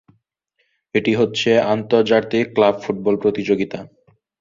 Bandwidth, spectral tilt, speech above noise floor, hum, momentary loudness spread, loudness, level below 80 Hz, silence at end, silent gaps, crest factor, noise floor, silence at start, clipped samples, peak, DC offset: 7.6 kHz; -6 dB/octave; 52 dB; none; 6 LU; -18 LUFS; -58 dBFS; 0.55 s; none; 18 dB; -69 dBFS; 0.95 s; under 0.1%; -2 dBFS; under 0.1%